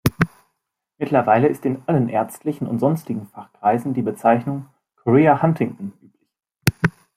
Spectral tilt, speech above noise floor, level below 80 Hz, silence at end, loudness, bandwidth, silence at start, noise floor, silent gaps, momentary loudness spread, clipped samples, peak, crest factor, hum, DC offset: -7 dB/octave; 58 dB; -50 dBFS; 0.25 s; -20 LUFS; 16 kHz; 0.05 s; -77 dBFS; none; 14 LU; under 0.1%; 0 dBFS; 20 dB; none; under 0.1%